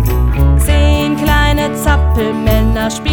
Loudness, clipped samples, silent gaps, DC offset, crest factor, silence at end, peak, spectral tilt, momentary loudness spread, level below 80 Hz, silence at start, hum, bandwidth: -13 LUFS; under 0.1%; none; under 0.1%; 10 dB; 0 s; 0 dBFS; -6 dB/octave; 3 LU; -14 dBFS; 0 s; none; over 20 kHz